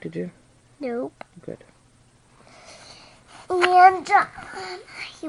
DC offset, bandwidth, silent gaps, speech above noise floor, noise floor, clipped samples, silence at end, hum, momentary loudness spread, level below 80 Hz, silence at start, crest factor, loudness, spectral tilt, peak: under 0.1%; 11.5 kHz; none; 35 dB; -57 dBFS; under 0.1%; 0 s; none; 27 LU; -62 dBFS; 0.05 s; 22 dB; -19 LUFS; -4.5 dB/octave; -2 dBFS